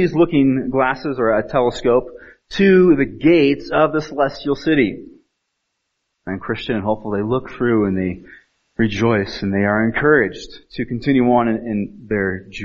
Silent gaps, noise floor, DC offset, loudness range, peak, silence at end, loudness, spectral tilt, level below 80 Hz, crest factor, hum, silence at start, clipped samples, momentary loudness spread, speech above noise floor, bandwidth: none; -74 dBFS; under 0.1%; 6 LU; -2 dBFS; 0 s; -17 LUFS; -5.5 dB/octave; -44 dBFS; 16 dB; none; 0 s; under 0.1%; 12 LU; 57 dB; 7.6 kHz